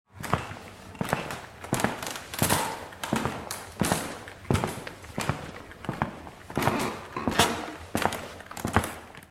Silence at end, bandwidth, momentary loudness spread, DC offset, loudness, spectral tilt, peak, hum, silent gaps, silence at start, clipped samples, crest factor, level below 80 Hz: 0.05 s; 16 kHz; 13 LU; under 0.1%; -30 LUFS; -4 dB/octave; -4 dBFS; none; none; 0.15 s; under 0.1%; 28 dB; -48 dBFS